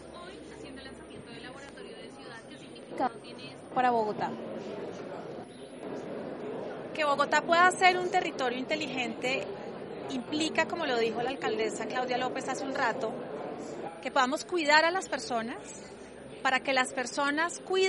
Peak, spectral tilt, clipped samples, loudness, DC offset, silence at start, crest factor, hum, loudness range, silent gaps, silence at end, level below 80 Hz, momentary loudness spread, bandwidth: -8 dBFS; -3 dB/octave; under 0.1%; -30 LUFS; under 0.1%; 0 s; 24 dB; none; 7 LU; none; 0 s; -68 dBFS; 20 LU; 11.5 kHz